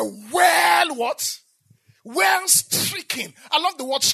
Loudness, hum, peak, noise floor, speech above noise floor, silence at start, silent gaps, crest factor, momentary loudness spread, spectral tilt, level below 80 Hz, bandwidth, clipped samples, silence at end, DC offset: -19 LUFS; none; -2 dBFS; -58 dBFS; 36 dB; 0 s; none; 18 dB; 12 LU; -0.5 dB/octave; -76 dBFS; 14 kHz; under 0.1%; 0 s; under 0.1%